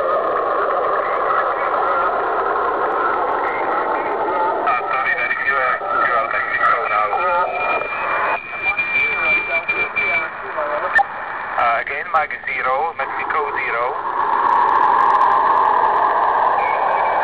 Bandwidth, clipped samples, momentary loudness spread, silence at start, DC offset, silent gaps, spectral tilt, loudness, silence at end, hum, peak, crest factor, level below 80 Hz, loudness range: 7.2 kHz; under 0.1%; 6 LU; 0 s; 0.2%; none; -5.5 dB/octave; -17 LUFS; 0 s; none; -4 dBFS; 14 dB; -52 dBFS; 4 LU